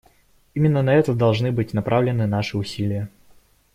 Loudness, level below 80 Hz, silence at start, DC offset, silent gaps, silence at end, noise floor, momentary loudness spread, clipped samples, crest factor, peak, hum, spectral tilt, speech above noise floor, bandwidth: -21 LUFS; -52 dBFS; 0.55 s; under 0.1%; none; 0.65 s; -57 dBFS; 9 LU; under 0.1%; 16 dB; -6 dBFS; none; -7.5 dB/octave; 37 dB; 13 kHz